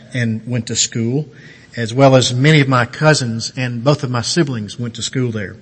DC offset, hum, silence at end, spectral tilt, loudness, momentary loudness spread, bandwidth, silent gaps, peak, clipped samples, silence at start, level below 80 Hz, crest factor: under 0.1%; none; 0.05 s; -5 dB/octave; -16 LUFS; 12 LU; 8.8 kHz; none; 0 dBFS; under 0.1%; 0 s; -54 dBFS; 16 dB